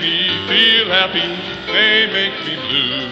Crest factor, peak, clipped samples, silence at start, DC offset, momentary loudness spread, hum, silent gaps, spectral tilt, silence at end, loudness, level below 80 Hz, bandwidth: 16 dB; -2 dBFS; under 0.1%; 0 s; under 0.1%; 9 LU; none; none; -4 dB/octave; 0 s; -14 LUFS; -50 dBFS; 9.6 kHz